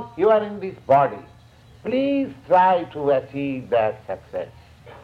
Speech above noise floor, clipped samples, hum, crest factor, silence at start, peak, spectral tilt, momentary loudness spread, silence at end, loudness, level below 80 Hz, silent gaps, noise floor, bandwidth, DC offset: 28 dB; under 0.1%; none; 18 dB; 0 s; -4 dBFS; -8 dB/octave; 15 LU; 0.05 s; -21 LUFS; -56 dBFS; none; -49 dBFS; 7 kHz; under 0.1%